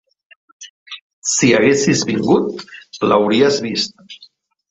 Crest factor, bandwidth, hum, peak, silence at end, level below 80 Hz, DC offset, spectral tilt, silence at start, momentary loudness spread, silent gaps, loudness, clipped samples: 16 dB; 8.2 kHz; none; -2 dBFS; 0.45 s; -56 dBFS; under 0.1%; -4 dB/octave; 0.6 s; 20 LU; 0.70-0.86 s, 1.01-1.22 s; -15 LUFS; under 0.1%